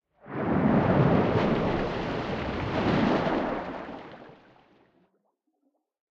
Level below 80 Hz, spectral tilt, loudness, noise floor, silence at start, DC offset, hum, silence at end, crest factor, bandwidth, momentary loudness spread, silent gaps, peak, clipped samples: -46 dBFS; -8.5 dB/octave; -26 LUFS; -75 dBFS; 0.25 s; under 0.1%; none; 1.8 s; 18 dB; 7.4 kHz; 17 LU; none; -10 dBFS; under 0.1%